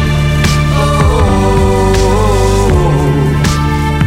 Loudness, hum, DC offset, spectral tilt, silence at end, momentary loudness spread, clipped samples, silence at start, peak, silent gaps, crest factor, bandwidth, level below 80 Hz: -11 LUFS; none; under 0.1%; -6 dB/octave; 0 s; 2 LU; under 0.1%; 0 s; 0 dBFS; none; 10 dB; 15.5 kHz; -16 dBFS